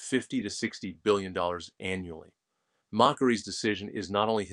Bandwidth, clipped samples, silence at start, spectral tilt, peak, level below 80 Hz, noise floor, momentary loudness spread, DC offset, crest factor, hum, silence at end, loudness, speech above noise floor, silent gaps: 11 kHz; under 0.1%; 0 s; -4.5 dB/octave; -6 dBFS; -64 dBFS; -79 dBFS; 11 LU; under 0.1%; 24 dB; none; 0 s; -30 LUFS; 50 dB; none